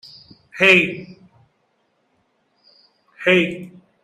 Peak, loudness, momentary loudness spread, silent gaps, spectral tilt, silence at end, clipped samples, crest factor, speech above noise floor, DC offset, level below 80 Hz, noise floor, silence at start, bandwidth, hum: 0 dBFS; -16 LUFS; 23 LU; none; -5 dB/octave; 0.35 s; under 0.1%; 22 dB; 50 dB; under 0.1%; -62 dBFS; -66 dBFS; 0.55 s; 14.5 kHz; none